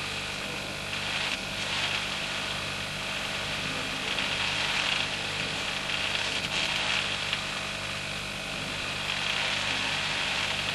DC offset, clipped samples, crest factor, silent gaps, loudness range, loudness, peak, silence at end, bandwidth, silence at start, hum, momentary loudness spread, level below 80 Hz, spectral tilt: under 0.1%; under 0.1%; 20 dB; none; 2 LU; -28 LUFS; -12 dBFS; 0 s; 15.5 kHz; 0 s; 50 Hz at -55 dBFS; 6 LU; -52 dBFS; -2 dB/octave